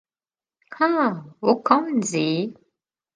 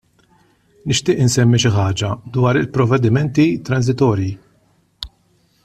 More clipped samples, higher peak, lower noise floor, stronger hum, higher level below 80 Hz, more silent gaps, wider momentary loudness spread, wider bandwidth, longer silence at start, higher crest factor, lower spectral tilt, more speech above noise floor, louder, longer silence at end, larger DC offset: neither; about the same, -2 dBFS vs -2 dBFS; first, under -90 dBFS vs -58 dBFS; neither; second, -74 dBFS vs -46 dBFS; neither; second, 6 LU vs 18 LU; second, 10 kHz vs 13.5 kHz; second, 0.7 s vs 0.85 s; first, 22 dB vs 14 dB; about the same, -5 dB/octave vs -5.5 dB/octave; first, over 69 dB vs 43 dB; second, -22 LUFS vs -16 LUFS; about the same, 0.6 s vs 0.6 s; neither